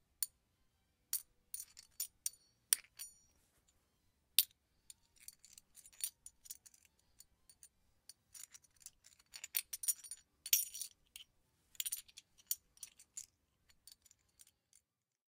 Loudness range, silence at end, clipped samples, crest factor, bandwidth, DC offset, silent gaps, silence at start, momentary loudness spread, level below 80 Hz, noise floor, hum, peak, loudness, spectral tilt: 12 LU; 2.15 s; under 0.1%; 40 dB; 16.5 kHz; under 0.1%; none; 0.2 s; 27 LU; -82 dBFS; -79 dBFS; none; -8 dBFS; -40 LUFS; 4 dB/octave